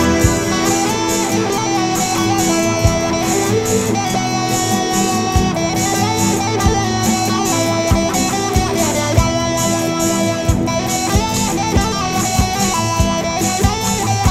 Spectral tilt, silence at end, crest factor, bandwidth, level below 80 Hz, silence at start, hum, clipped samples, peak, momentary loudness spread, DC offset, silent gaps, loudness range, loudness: -4 dB/octave; 0 s; 16 dB; 16 kHz; -28 dBFS; 0 s; none; under 0.1%; 0 dBFS; 2 LU; under 0.1%; none; 1 LU; -16 LUFS